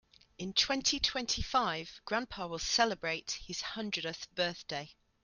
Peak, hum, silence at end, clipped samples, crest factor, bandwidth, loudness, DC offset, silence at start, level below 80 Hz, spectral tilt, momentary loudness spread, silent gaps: -14 dBFS; none; 0.3 s; under 0.1%; 22 dB; 12 kHz; -33 LUFS; under 0.1%; 0.4 s; -54 dBFS; -2 dB/octave; 11 LU; none